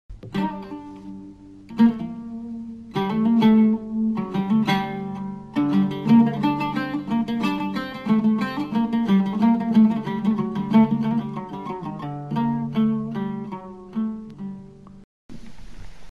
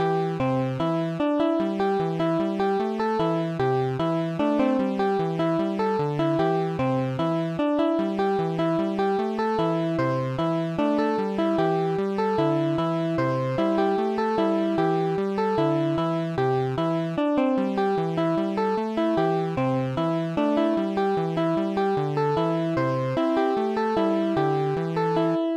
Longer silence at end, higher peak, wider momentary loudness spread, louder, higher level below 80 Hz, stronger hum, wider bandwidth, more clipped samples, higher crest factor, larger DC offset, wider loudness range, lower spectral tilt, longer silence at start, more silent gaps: about the same, 0 s vs 0 s; first, -6 dBFS vs -10 dBFS; first, 17 LU vs 2 LU; about the same, -22 LUFS vs -24 LUFS; first, -52 dBFS vs -58 dBFS; neither; second, 6.4 kHz vs 9.6 kHz; neither; about the same, 16 dB vs 12 dB; neither; first, 7 LU vs 1 LU; about the same, -8 dB/octave vs -8 dB/octave; about the same, 0.1 s vs 0 s; first, 15.04-15.29 s vs none